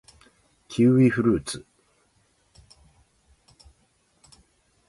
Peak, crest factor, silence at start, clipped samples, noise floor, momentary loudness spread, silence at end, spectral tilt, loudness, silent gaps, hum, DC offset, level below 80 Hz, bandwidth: -8 dBFS; 20 dB; 0.7 s; under 0.1%; -66 dBFS; 17 LU; 3.3 s; -7 dB/octave; -22 LUFS; none; none; under 0.1%; -56 dBFS; 11.5 kHz